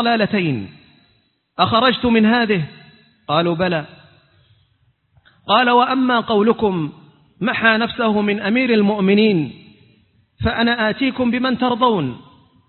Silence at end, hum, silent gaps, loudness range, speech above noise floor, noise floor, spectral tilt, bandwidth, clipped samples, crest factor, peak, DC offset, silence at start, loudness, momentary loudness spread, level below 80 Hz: 0.5 s; none; none; 3 LU; 45 dB; -61 dBFS; -10.5 dB/octave; 4.4 kHz; under 0.1%; 18 dB; 0 dBFS; under 0.1%; 0 s; -17 LUFS; 13 LU; -46 dBFS